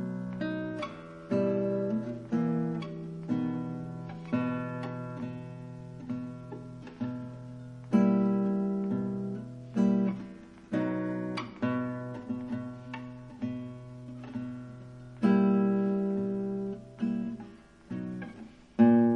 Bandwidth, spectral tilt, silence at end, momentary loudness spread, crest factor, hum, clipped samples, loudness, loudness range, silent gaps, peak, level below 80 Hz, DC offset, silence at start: 6.8 kHz; -9 dB/octave; 0 s; 18 LU; 20 dB; none; under 0.1%; -32 LUFS; 7 LU; none; -10 dBFS; -64 dBFS; under 0.1%; 0 s